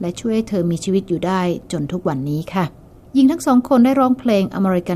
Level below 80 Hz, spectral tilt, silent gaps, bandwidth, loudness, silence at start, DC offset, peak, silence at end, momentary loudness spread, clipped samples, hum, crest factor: -48 dBFS; -7 dB/octave; none; 14 kHz; -18 LUFS; 0 s; under 0.1%; -4 dBFS; 0 s; 9 LU; under 0.1%; none; 14 dB